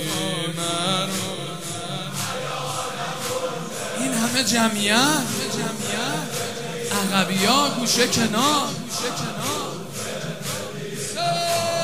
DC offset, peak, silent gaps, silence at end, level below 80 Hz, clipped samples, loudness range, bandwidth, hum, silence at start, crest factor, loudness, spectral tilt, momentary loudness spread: 0.7%; -4 dBFS; none; 0 s; -60 dBFS; under 0.1%; 5 LU; 16 kHz; none; 0 s; 20 dB; -23 LUFS; -3 dB/octave; 11 LU